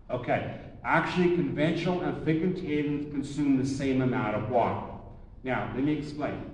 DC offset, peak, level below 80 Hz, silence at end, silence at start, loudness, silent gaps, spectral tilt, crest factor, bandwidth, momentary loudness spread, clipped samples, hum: under 0.1%; -12 dBFS; -50 dBFS; 0 s; 0.05 s; -29 LUFS; none; -7 dB/octave; 16 dB; 10.5 kHz; 8 LU; under 0.1%; none